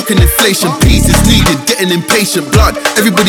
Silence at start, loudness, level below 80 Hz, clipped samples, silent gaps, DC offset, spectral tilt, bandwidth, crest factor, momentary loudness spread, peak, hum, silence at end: 0 s; -9 LUFS; -16 dBFS; 0.4%; none; under 0.1%; -4 dB/octave; over 20 kHz; 8 dB; 3 LU; 0 dBFS; none; 0 s